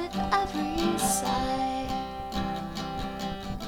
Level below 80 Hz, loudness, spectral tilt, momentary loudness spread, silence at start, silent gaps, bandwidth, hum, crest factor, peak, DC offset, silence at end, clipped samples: -44 dBFS; -29 LUFS; -4 dB/octave; 8 LU; 0 s; none; 19 kHz; none; 18 dB; -12 dBFS; 0.2%; 0 s; under 0.1%